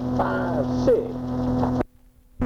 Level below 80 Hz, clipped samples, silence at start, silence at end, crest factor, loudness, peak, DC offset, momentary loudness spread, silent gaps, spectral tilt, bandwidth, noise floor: -40 dBFS; under 0.1%; 0 s; 0 s; 14 dB; -24 LUFS; -10 dBFS; under 0.1%; 7 LU; none; -8.5 dB/octave; 7.2 kHz; -53 dBFS